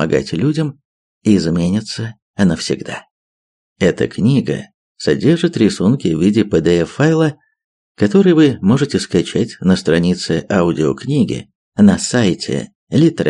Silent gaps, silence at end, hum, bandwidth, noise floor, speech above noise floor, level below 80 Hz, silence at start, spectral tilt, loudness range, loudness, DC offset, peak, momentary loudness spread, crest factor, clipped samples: 0.85-1.21 s, 2.22-2.34 s, 3.11-3.76 s, 4.74-4.95 s, 7.64-7.95 s, 11.55-11.72 s, 12.75-12.87 s; 0 s; none; 11 kHz; under -90 dBFS; over 76 dB; -46 dBFS; 0 s; -6.5 dB/octave; 4 LU; -15 LUFS; under 0.1%; 0 dBFS; 10 LU; 14 dB; under 0.1%